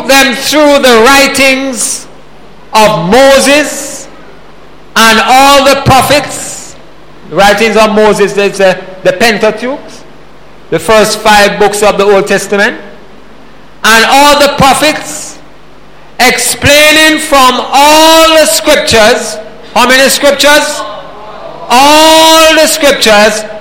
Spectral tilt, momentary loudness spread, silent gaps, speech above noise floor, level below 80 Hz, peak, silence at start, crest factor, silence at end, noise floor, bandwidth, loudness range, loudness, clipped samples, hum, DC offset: -2.5 dB/octave; 15 LU; none; 30 dB; -32 dBFS; 0 dBFS; 0 s; 6 dB; 0 s; -35 dBFS; over 20 kHz; 4 LU; -5 LUFS; 3%; none; 5%